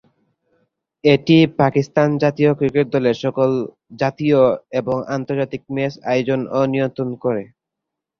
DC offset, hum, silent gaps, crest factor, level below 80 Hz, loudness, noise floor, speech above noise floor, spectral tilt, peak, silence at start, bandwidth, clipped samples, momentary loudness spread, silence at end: under 0.1%; none; none; 18 dB; -56 dBFS; -18 LUFS; -82 dBFS; 65 dB; -7.5 dB/octave; 0 dBFS; 1.05 s; 6.8 kHz; under 0.1%; 9 LU; 0.75 s